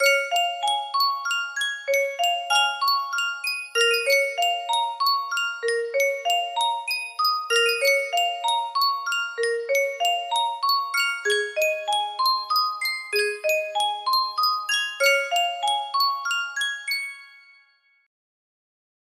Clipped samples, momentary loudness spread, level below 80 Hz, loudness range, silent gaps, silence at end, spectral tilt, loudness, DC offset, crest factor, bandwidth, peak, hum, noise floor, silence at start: under 0.1%; 6 LU; -78 dBFS; 2 LU; none; 1.75 s; 2.5 dB/octave; -23 LUFS; under 0.1%; 18 dB; 16 kHz; -6 dBFS; none; -61 dBFS; 0 s